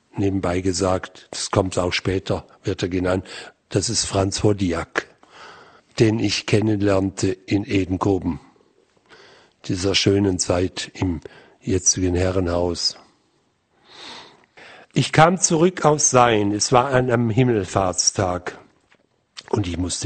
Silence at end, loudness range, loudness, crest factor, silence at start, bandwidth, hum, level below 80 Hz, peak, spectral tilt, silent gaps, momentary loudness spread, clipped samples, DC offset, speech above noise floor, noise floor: 0 s; 6 LU; -20 LUFS; 22 dB; 0.15 s; 9.4 kHz; none; -46 dBFS; 0 dBFS; -4 dB/octave; none; 12 LU; under 0.1%; under 0.1%; 45 dB; -65 dBFS